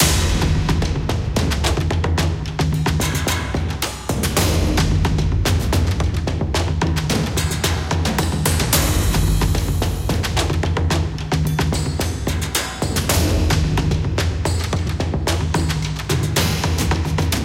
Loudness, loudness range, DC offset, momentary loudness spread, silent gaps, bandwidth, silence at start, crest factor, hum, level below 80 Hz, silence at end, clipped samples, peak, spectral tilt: -20 LUFS; 1 LU; under 0.1%; 4 LU; none; 17 kHz; 0 s; 16 dB; none; -24 dBFS; 0 s; under 0.1%; -2 dBFS; -4.5 dB/octave